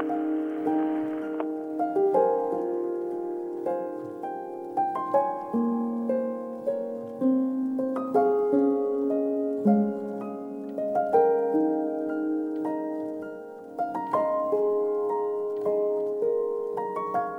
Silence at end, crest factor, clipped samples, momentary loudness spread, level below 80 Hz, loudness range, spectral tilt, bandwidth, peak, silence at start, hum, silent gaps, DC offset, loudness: 0 s; 18 dB; under 0.1%; 10 LU; -80 dBFS; 3 LU; -9.5 dB/octave; 4.5 kHz; -10 dBFS; 0 s; none; none; under 0.1%; -27 LUFS